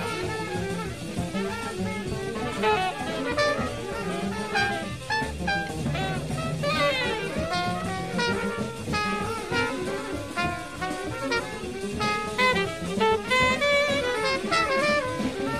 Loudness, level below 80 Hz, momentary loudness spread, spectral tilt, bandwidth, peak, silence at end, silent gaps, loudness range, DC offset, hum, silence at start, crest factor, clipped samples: -26 LUFS; -46 dBFS; 9 LU; -4.5 dB/octave; 15 kHz; -10 dBFS; 0 s; none; 5 LU; 0.3%; none; 0 s; 16 dB; under 0.1%